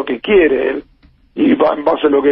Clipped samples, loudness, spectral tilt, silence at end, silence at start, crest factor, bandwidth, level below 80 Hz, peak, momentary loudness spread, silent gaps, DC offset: under 0.1%; -13 LUFS; -10 dB/octave; 0 s; 0 s; 14 dB; 5.4 kHz; -44 dBFS; 0 dBFS; 10 LU; none; under 0.1%